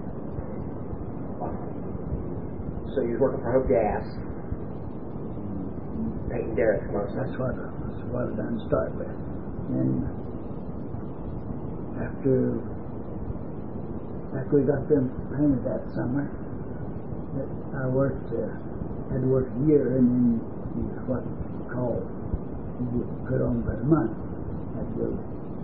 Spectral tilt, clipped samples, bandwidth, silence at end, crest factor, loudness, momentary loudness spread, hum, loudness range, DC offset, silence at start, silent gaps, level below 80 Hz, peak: -13 dB/octave; under 0.1%; 4.9 kHz; 0 s; 22 dB; -29 LUFS; 12 LU; none; 5 LU; 1%; 0 s; none; -42 dBFS; -8 dBFS